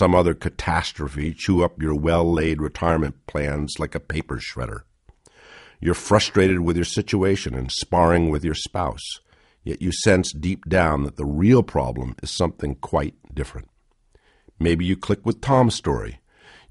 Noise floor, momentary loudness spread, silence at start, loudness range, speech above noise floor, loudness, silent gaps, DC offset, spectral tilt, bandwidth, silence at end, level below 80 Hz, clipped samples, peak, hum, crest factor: -60 dBFS; 12 LU; 0 s; 6 LU; 39 dB; -22 LUFS; none; under 0.1%; -5.5 dB/octave; 11.5 kHz; 0.55 s; -36 dBFS; under 0.1%; -2 dBFS; none; 20 dB